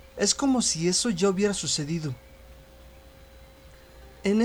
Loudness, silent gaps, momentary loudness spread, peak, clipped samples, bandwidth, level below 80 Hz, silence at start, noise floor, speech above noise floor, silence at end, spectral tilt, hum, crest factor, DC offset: -25 LUFS; none; 9 LU; -8 dBFS; under 0.1%; over 20 kHz; -52 dBFS; 0.15 s; -50 dBFS; 25 dB; 0 s; -3.5 dB/octave; none; 20 dB; under 0.1%